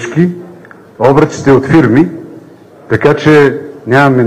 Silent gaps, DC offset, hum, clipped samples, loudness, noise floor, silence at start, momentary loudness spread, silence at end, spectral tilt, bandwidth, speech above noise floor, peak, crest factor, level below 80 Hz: none; under 0.1%; none; 0.6%; -9 LUFS; -36 dBFS; 0 s; 10 LU; 0 s; -7.5 dB/octave; 11 kHz; 28 dB; 0 dBFS; 10 dB; -42 dBFS